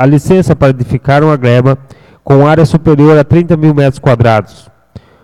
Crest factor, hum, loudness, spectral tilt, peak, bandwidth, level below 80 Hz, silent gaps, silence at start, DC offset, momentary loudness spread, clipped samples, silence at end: 8 dB; none; -8 LUFS; -8.5 dB/octave; 0 dBFS; 11.5 kHz; -34 dBFS; none; 0 s; under 0.1%; 5 LU; 0.6%; 0.25 s